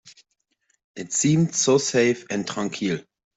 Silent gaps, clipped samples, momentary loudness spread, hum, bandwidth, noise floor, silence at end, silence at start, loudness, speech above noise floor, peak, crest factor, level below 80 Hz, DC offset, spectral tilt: 0.84-0.94 s; under 0.1%; 9 LU; none; 8.4 kHz; -71 dBFS; 0.35 s; 0.05 s; -22 LUFS; 49 dB; -8 dBFS; 16 dB; -64 dBFS; under 0.1%; -4.5 dB/octave